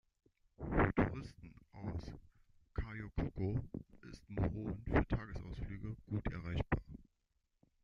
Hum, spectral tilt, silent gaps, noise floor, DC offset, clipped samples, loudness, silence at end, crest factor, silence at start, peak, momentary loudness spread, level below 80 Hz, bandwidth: none; -9 dB/octave; none; -83 dBFS; under 0.1%; under 0.1%; -41 LUFS; 0.8 s; 24 dB; 0.6 s; -18 dBFS; 20 LU; -48 dBFS; 7 kHz